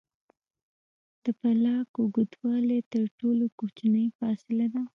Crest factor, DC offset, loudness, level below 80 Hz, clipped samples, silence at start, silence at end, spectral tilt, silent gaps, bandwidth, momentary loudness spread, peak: 14 dB; under 0.1%; -28 LUFS; -78 dBFS; under 0.1%; 1.25 s; 0.1 s; -9 dB/octave; 1.89-1.94 s, 2.86-2.91 s, 3.11-3.18 s, 3.52-3.58 s, 4.15-4.19 s; 3.9 kHz; 6 LU; -14 dBFS